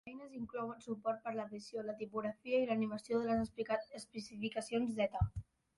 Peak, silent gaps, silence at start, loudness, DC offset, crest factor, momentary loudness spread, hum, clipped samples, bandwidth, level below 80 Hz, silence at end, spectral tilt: -22 dBFS; none; 0.05 s; -40 LUFS; under 0.1%; 18 dB; 11 LU; none; under 0.1%; 11.5 kHz; -56 dBFS; 0.35 s; -6.5 dB/octave